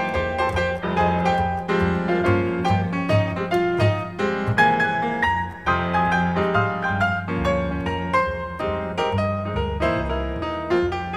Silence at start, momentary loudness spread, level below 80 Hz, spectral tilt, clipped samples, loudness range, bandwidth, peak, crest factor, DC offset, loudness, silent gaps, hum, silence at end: 0 s; 5 LU; -38 dBFS; -7 dB/octave; under 0.1%; 3 LU; 11.5 kHz; -4 dBFS; 18 dB; 0.2%; -22 LUFS; none; none; 0 s